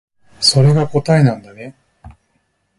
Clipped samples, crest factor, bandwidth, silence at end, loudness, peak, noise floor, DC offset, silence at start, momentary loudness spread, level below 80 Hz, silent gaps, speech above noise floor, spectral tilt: under 0.1%; 16 dB; 11.5 kHz; 0.7 s; -13 LUFS; 0 dBFS; -64 dBFS; under 0.1%; 0.4 s; 24 LU; -48 dBFS; none; 51 dB; -5.5 dB/octave